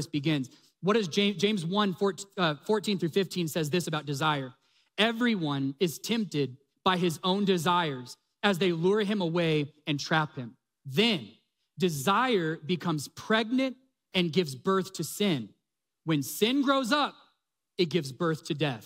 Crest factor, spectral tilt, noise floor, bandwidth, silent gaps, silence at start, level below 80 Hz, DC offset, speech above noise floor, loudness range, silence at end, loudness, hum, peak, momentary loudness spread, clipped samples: 18 dB; -5 dB/octave; -77 dBFS; 16 kHz; none; 0 s; -72 dBFS; under 0.1%; 49 dB; 2 LU; 0 s; -28 LUFS; none; -10 dBFS; 8 LU; under 0.1%